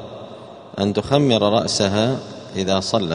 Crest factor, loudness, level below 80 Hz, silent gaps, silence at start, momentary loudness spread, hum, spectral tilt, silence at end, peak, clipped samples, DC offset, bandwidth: 20 dB; -19 LUFS; -52 dBFS; none; 0 s; 19 LU; none; -5 dB/octave; 0 s; 0 dBFS; under 0.1%; under 0.1%; 10.5 kHz